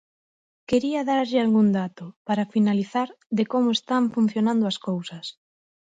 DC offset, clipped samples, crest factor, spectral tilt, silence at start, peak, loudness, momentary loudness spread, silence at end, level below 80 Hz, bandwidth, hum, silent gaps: under 0.1%; under 0.1%; 16 dB; -6.5 dB/octave; 0.7 s; -8 dBFS; -23 LUFS; 11 LU; 0.65 s; -64 dBFS; 7.8 kHz; none; 2.16-2.25 s, 3.26-3.30 s